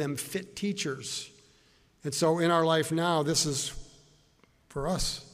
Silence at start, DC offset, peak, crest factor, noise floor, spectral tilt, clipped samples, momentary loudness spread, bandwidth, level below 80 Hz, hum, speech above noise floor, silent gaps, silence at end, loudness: 0 s; under 0.1%; -12 dBFS; 18 dB; -64 dBFS; -4 dB/octave; under 0.1%; 13 LU; 15.5 kHz; -50 dBFS; none; 35 dB; none; 0.05 s; -29 LUFS